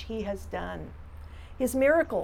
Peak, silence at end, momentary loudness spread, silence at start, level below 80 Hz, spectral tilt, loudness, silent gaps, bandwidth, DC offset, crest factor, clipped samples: -12 dBFS; 0 s; 23 LU; 0 s; -46 dBFS; -5.5 dB/octave; -28 LUFS; none; 18 kHz; under 0.1%; 18 dB; under 0.1%